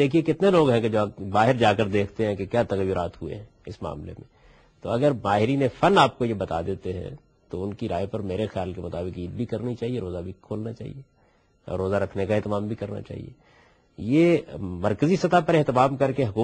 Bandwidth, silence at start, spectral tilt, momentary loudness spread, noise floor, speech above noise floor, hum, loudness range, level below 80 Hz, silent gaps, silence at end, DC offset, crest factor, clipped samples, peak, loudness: 9 kHz; 0 s; -7 dB/octave; 16 LU; -62 dBFS; 38 dB; none; 8 LU; -52 dBFS; none; 0 s; under 0.1%; 20 dB; under 0.1%; -4 dBFS; -24 LUFS